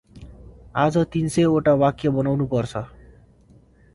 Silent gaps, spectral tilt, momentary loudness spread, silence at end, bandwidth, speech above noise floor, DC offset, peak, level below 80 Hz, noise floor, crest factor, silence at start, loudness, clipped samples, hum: none; -7 dB/octave; 12 LU; 1.1 s; 11.5 kHz; 33 dB; under 0.1%; -6 dBFS; -48 dBFS; -53 dBFS; 18 dB; 0.15 s; -21 LUFS; under 0.1%; none